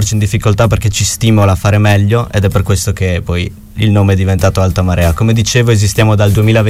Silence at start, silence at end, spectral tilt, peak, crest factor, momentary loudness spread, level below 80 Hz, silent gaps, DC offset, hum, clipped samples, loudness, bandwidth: 0 s; 0 s; -5.5 dB/octave; 0 dBFS; 10 dB; 5 LU; -26 dBFS; none; under 0.1%; none; under 0.1%; -11 LUFS; 15.5 kHz